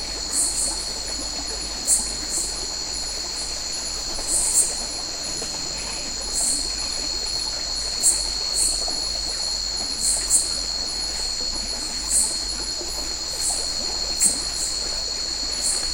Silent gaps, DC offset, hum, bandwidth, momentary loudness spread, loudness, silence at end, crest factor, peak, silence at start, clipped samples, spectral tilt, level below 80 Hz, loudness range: none; under 0.1%; none; 16 kHz; 7 LU; -22 LUFS; 0 s; 22 dB; -4 dBFS; 0 s; under 0.1%; 0 dB/octave; -40 dBFS; 3 LU